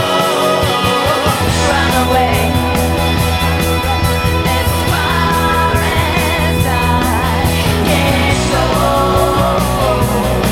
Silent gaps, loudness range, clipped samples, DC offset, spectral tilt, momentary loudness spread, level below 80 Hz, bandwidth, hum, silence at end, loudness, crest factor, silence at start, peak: none; 1 LU; under 0.1%; under 0.1%; -5 dB/octave; 2 LU; -22 dBFS; 16.5 kHz; none; 0 s; -13 LUFS; 12 dB; 0 s; 0 dBFS